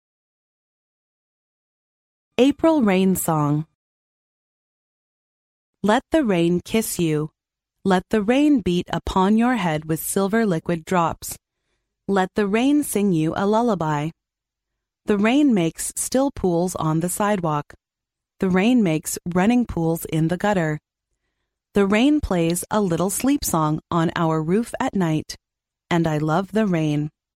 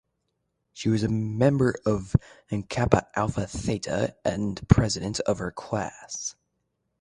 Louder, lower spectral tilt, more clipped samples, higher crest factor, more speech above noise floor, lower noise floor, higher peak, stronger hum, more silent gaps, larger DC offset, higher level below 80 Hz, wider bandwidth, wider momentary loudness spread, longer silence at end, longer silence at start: first, -21 LUFS vs -26 LUFS; about the same, -5.5 dB/octave vs -6 dB/octave; neither; second, 18 dB vs 26 dB; first, 66 dB vs 52 dB; first, -86 dBFS vs -77 dBFS; second, -4 dBFS vs 0 dBFS; neither; first, 3.75-5.73 s vs none; neither; about the same, -46 dBFS vs -42 dBFS; first, 16 kHz vs 11 kHz; second, 8 LU vs 11 LU; second, 0.3 s vs 0.7 s; first, 2.4 s vs 0.75 s